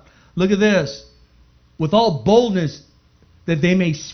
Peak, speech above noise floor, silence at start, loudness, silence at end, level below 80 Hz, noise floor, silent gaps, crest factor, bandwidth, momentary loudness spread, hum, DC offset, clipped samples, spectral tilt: -2 dBFS; 36 dB; 0.35 s; -18 LUFS; 0 s; -48 dBFS; -53 dBFS; none; 18 dB; 6.6 kHz; 14 LU; 60 Hz at -45 dBFS; under 0.1%; under 0.1%; -6 dB/octave